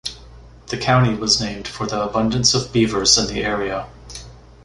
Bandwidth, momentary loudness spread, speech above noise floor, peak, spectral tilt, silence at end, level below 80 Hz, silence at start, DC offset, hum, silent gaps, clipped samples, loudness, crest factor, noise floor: 11.5 kHz; 17 LU; 23 dB; 0 dBFS; -3.5 dB/octave; 0.25 s; -40 dBFS; 0.05 s; under 0.1%; none; none; under 0.1%; -18 LUFS; 20 dB; -42 dBFS